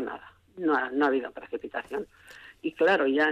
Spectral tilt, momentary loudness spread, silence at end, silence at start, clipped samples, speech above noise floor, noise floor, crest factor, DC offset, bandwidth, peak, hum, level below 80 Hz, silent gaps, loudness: -5.5 dB/octave; 20 LU; 0 s; 0 s; under 0.1%; 23 dB; -49 dBFS; 14 dB; under 0.1%; 11 kHz; -14 dBFS; none; -68 dBFS; none; -28 LUFS